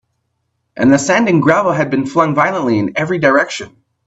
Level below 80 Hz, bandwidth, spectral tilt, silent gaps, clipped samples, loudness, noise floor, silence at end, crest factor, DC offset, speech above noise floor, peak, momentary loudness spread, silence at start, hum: -54 dBFS; 8.2 kHz; -5.5 dB/octave; none; under 0.1%; -13 LUFS; -68 dBFS; 0.4 s; 14 dB; under 0.1%; 55 dB; 0 dBFS; 6 LU; 0.75 s; none